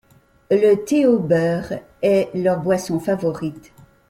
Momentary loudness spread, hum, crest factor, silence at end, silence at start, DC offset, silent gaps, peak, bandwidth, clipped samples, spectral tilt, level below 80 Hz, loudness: 9 LU; none; 14 dB; 0.5 s; 0.5 s; under 0.1%; none; -4 dBFS; 15.5 kHz; under 0.1%; -7 dB/octave; -56 dBFS; -19 LUFS